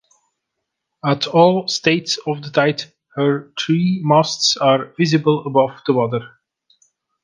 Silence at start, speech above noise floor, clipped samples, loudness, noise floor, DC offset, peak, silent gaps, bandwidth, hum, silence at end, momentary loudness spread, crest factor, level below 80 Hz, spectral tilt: 1.05 s; 61 dB; under 0.1%; -17 LUFS; -78 dBFS; under 0.1%; 0 dBFS; none; 10 kHz; none; 0.95 s; 8 LU; 18 dB; -64 dBFS; -5 dB/octave